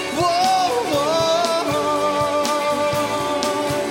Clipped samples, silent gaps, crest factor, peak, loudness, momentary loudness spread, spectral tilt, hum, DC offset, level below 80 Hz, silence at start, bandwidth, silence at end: under 0.1%; none; 16 dB; -2 dBFS; -19 LUFS; 4 LU; -3.5 dB/octave; none; under 0.1%; -52 dBFS; 0 s; 17 kHz; 0 s